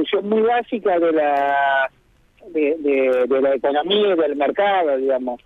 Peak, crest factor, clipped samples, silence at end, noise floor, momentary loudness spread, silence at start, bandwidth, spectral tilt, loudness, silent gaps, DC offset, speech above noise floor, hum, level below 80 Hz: -6 dBFS; 12 dB; under 0.1%; 0.1 s; -52 dBFS; 4 LU; 0 s; 4.2 kHz; -6.5 dB/octave; -19 LUFS; none; under 0.1%; 33 dB; none; -60 dBFS